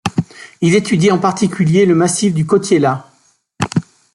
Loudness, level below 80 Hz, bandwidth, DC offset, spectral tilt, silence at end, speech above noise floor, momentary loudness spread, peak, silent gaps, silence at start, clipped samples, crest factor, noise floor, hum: -14 LUFS; -52 dBFS; 11.5 kHz; under 0.1%; -5.5 dB/octave; 0.35 s; 43 dB; 10 LU; -2 dBFS; none; 0.05 s; under 0.1%; 14 dB; -56 dBFS; none